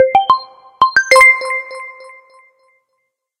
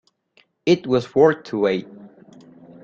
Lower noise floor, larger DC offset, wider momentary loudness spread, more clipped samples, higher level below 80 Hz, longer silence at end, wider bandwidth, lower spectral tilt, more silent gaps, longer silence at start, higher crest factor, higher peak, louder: first, -70 dBFS vs -60 dBFS; neither; first, 22 LU vs 8 LU; neither; first, -54 dBFS vs -62 dBFS; first, 1.5 s vs 0.75 s; first, 16.5 kHz vs 7.6 kHz; second, -0.5 dB/octave vs -6.5 dB/octave; neither; second, 0 s vs 0.65 s; second, 14 dB vs 20 dB; about the same, 0 dBFS vs -2 dBFS; first, -11 LUFS vs -20 LUFS